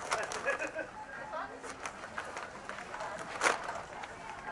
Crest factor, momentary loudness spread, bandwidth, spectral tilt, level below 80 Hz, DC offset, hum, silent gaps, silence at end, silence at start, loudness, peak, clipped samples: 26 dB; 12 LU; 11.5 kHz; -2 dB/octave; -66 dBFS; under 0.1%; none; none; 0 s; 0 s; -38 LUFS; -14 dBFS; under 0.1%